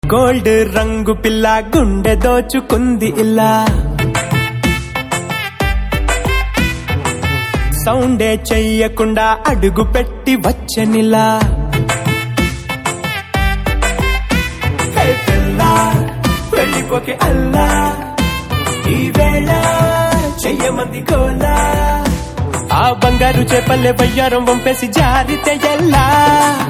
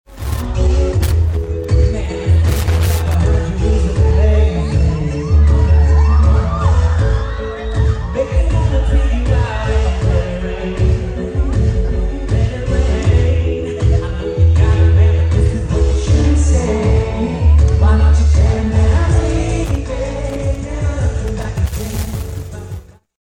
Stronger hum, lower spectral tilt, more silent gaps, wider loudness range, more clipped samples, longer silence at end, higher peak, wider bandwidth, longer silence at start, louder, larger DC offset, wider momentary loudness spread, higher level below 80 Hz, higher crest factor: neither; second, -5 dB/octave vs -7 dB/octave; neither; about the same, 3 LU vs 4 LU; neither; second, 0 s vs 0.4 s; about the same, 0 dBFS vs -2 dBFS; about the same, 16 kHz vs 15 kHz; about the same, 0.05 s vs 0.1 s; about the same, -14 LUFS vs -15 LUFS; neither; second, 6 LU vs 10 LU; about the same, -20 dBFS vs -16 dBFS; about the same, 12 dB vs 12 dB